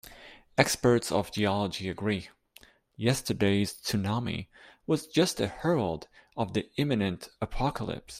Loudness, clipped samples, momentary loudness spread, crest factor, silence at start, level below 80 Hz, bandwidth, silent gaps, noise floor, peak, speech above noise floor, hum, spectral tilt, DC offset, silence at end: -29 LUFS; under 0.1%; 12 LU; 24 dB; 0.05 s; -52 dBFS; 15.5 kHz; none; -58 dBFS; -4 dBFS; 30 dB; none; -5 dB/octave; under 0.1%; 0 s